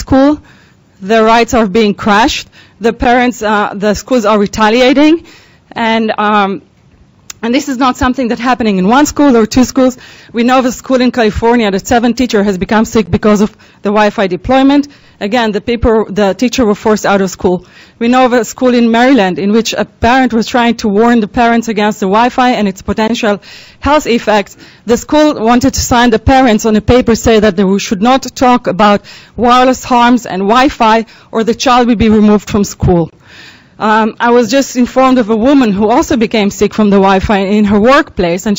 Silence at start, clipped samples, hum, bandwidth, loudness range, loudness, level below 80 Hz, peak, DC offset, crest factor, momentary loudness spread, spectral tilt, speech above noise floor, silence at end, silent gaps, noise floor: 0 s; under 0.1%; none; 16.5 kHz; 3 LU; -10 LUFS; -30 dBFS; 0 dBFS; under 0.1%; 10 dB; 7 LU; -5 dB/octave; 35 dB; 0 s; none; -44 dBFS